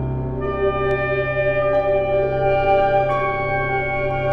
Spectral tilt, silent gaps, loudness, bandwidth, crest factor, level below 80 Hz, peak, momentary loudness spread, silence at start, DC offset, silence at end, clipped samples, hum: -8.5 dB/octave; none; -19 LUFS; 5.8 kHz; 14 dB; -34 dBFS; -6 dBFS; 5 LU; 0 s; under 0.1%; 0 s; under 0.1%; none